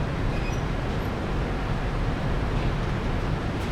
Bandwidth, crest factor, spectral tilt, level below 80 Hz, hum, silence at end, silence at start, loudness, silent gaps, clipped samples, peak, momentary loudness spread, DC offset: 12.5 kHz; 12 dB; -7 dB/octave; -30 dBFS; none; 0 s; 0 s; -28 LUFS; none; under 0.1%; -14 dBFS; 1 LU; under 0.1%